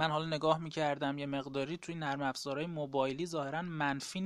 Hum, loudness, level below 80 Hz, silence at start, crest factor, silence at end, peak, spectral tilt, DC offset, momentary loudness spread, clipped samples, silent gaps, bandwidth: none; -36 LUFS; -68 dBFS; 0 s; 20 dB; 0 s; -16 dBFS; -5 dB/octave; under 0.1%; 6 LU; under 0.1%; none; 14 kHz